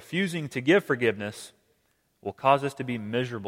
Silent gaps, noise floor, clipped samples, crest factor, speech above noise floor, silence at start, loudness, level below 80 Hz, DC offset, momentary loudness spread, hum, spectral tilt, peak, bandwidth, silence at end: none; -71 dBFS; under 0.1%; 20 dB; 44 dB; 0 s; -26 LUFS; -70 dBFS; under 0.1%; 16 LU; none; -5.5 dB/octave; -6 dBFS; 16.5 kHz; 0 s